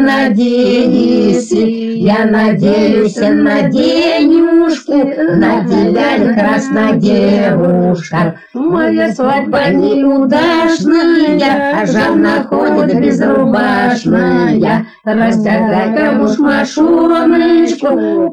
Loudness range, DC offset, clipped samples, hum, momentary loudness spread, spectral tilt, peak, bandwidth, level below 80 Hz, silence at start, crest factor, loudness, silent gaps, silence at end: 1 LU; under 0.1%; under 0.1%; none; 4 LU; -6.5 dB/octave; 0 dBFS; 10 kHz; -44 dBFS; 0 s; 10 dB; -11 LUFS; none; 0 s